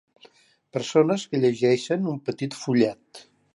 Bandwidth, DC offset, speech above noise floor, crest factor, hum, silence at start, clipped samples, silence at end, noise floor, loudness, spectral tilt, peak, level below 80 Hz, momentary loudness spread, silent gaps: 11.5 kHz; under 0.1%; 33 dB; 18 dB; none; 0.75 s; under 0.1%; 0.35 s; -56 dBFS; -24 LUFS; -6 dB/octave; -6 dBFS; -72 dBFS; 10 LU; none